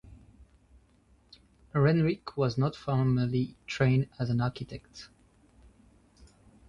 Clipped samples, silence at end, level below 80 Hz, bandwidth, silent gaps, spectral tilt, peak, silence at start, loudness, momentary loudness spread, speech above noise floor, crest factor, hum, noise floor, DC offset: under 0.1%; 1.65 s; -56 dBFS; 7.4 kHz; none; -8 dB/octave; -12 dBFS; 0.1 s; -29 LUFS; 18 LU; 35 dB; 18 dB; none; -64 dBFS; under 0.1%